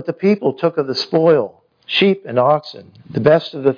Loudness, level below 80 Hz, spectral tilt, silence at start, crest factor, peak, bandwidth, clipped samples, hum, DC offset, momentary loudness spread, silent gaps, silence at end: -16 LUFS; -62 dBFS; -7 dB/octave; 0 s; 16 dB; 0 dBFS; 5.2 kHz; under 0.1%; none; under 0.1%; 6 LU; none; 0 s